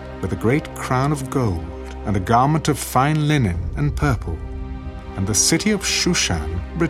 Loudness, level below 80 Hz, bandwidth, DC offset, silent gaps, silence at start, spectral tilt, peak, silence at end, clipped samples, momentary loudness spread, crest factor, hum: -20 LUFS; -32 dBFS; 16 kHz; under 0.1%; none; 0 s; -4.5 dB/octave; -2 dBFS; 0 s; under 0.1%; 14 LU; 18 dB; none